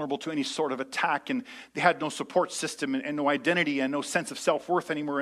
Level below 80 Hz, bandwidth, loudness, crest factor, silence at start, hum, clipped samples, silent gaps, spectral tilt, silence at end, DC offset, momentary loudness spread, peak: -76 dBFS; 14 kHz; -28 LUFS; 22 dB; 0 s; none; under 0.1%; none; -4 dB/octave; 0 s; under 0.1%; 6 LU; -8 dBFS